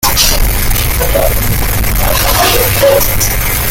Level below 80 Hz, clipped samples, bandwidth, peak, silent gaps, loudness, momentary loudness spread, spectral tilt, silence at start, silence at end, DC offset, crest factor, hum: -16 dBFS; under 0.1%; 17.5 kHz; 0 dBFS; none; -10 LUFS; 4 LU; -3 dB/octave; 0 s; 0 s; under 0.1%; 10 dB; none